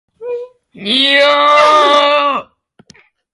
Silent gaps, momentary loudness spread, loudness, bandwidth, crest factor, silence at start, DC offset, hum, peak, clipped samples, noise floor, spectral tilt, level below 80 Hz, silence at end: none; 17 LU; -9 LUFS; 11.5 kHz; 12 dB; 0.2 s; under 0.1%; none; 0 dBFS; under 0.1%; -47 dBFS; -2 dB/octave; -62 dBFS; 0.9 s